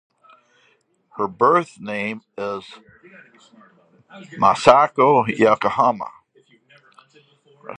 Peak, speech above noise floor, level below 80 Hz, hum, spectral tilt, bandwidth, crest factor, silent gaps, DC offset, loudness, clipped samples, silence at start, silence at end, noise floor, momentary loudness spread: 0 dBFS; 43 dB; -62 dBFS; none; -5.5 dB/octave; 10 kHz; 22 dB; none; under 0.1%; -18 LUFS; under 0.1%; 1.15 s; 0.05 s; -62 dBFS; 17 LU